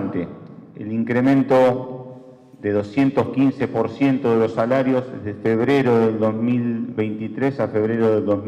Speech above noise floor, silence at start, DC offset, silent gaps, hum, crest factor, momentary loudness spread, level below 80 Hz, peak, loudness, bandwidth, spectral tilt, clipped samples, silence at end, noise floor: 24 dB; 0 s; under 0.1%; none; none; 12 dB; 13 LU; -60 dBFS; -8 dBFS; -20 LUFS; 8.4 kHz; -8.5 dB/octave; under 0.1%; 0 s; -43 dBFS